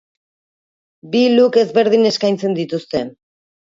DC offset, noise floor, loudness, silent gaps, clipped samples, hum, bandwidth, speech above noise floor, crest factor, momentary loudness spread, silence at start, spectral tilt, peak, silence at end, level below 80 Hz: under 0.1%; under -90 dBFS; -15 LUFS; none; under 0.1%; none; 7.6 kHz; over 75 dB; 16 dB; 11 LU; 1.05 s; -5.5 dB/octave; -2 dBFS; 0.65 s; -60 dBFS